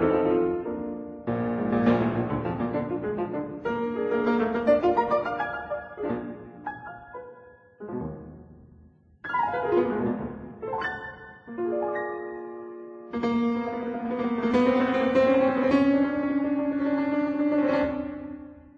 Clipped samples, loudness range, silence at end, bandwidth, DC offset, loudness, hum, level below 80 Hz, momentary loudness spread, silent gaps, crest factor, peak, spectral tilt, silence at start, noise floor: under 0.1%; 10 LU; 0.2 s; 7.2 kHz; under 0.1%; -26 LUFS; none; -54 dBFS; 17 LU; none; 16 dB; -10 dBFS; -8.5 dB/octave; 0 s; -55 dBFS